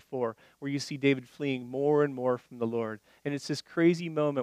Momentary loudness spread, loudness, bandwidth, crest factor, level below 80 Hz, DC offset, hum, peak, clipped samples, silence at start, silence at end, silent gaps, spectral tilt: 10 LU; -30 LUFS; 13.5 kHz; 18 dB; -78 dBFS; under 0.1%; none; -12 dBFS; under 0.1%; 0.1 s; 0 s; none; -6 dB/octave